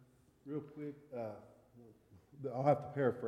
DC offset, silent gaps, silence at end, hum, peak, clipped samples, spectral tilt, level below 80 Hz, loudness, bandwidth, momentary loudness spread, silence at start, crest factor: under 0.1%; none; 0 s; none; -18 dBFS; under 0.1%; -9 dB/octave; -78 dBFS; -39 LUFS; 12 kHz; 15 LU; 0.45 s; 22 dB